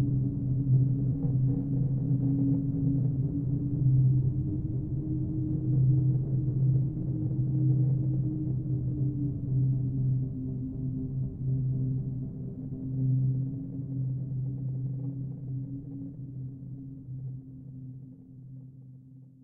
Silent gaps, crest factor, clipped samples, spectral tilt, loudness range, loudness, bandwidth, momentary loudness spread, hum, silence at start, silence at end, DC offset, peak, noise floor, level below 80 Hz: none; 14 dB; under 0.1%; -15 dB/octave; 11 LU; -30 LUFS; 1 kHz; 16 LU; none; 0 s; 0.15 s; under 0.1%; -16 dBFS; -51 dBFS; -46 dBFS